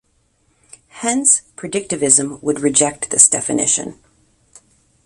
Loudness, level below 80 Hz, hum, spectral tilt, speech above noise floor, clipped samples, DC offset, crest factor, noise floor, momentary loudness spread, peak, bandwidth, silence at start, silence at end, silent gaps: -14 LUFS; -56 dBFS; none; -2.5 dB/octave; 44 dB; under 0.1%; under 0.1%; 18 dB; -61 dBFS; 13 LU; 0 dBFS; 16 kHz; 0.95 s; 1.1 s; none